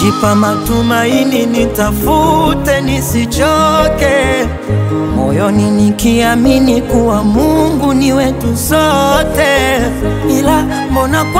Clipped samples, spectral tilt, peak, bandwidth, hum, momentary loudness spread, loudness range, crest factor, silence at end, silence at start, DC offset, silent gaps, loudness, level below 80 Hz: under 0.1%; -5.5 dB/octave; 0 dBFS; 16.5 kHz; none; 4 LU; 1 LU; 10 dB; 0 s; 0 s; under 0.1%; none; -11 LUFS; -24 dBFS